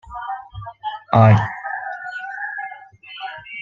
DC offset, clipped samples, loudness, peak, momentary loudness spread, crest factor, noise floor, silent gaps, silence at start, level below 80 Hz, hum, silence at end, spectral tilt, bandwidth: under 0.1%; under 0.1%; -20 LUFS; 0 dBFS; 20 LU; 20 dB; -39 dBFS; none; 0.05 s; -50 dBFS; none; 0 s; -8.5 dB/octave; 6.4 kHz